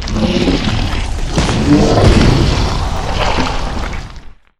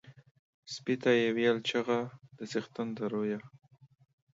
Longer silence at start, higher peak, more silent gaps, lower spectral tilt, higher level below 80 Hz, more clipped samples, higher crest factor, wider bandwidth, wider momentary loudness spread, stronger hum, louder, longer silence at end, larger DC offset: about the same, 0 s vs 0.05 s; first, 0 dBFS vs -14 dBFS; second, none vs 0.31-0.63 s; about the same, -5.5 dB/octave vs -5 dB/octave; first, -18 dBFS vs -80 dBFS; neither; second, 12 dB vs 20 dB; first, 12.5 kHz vs 7.8 kHz; about the same, 12 LU vs 14 LU; neither; first, -14 LUFS vs -32 LUFS; second, 0.3 s vs 0.85 s; neither